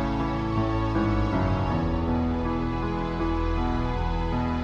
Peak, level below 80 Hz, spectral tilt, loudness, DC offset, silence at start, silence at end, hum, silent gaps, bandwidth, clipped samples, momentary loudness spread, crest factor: -12 dBFS; -32 dBFS; -8.5 dB/octave; -27 LUFS; under 0.1%; 0 s; 0 s; none; none; 7.4 kHz; under 0.1%; 3 LU; 14 dB